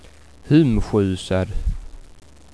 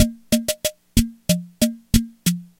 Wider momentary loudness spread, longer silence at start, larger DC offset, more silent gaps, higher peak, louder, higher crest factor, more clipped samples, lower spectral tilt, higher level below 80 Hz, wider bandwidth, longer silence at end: first, 14 LU vs 4 LU; first, 0.45 s vs 0 s; first, 0.4% vs under 0.1%; neither; about the same, -2 dBFS vs 0 dBFS; about the same, -20 LUFS vs -22 LUFS; about the same, 18 dB vs 22 dB; neither; first, -7.5 dB/octave vs -4.5 dB/octave; about the same, -30 dBFS vs -30 dBFS; second, 11 kHz vs 17 kHz; first, 0.5 s vs 0.15 s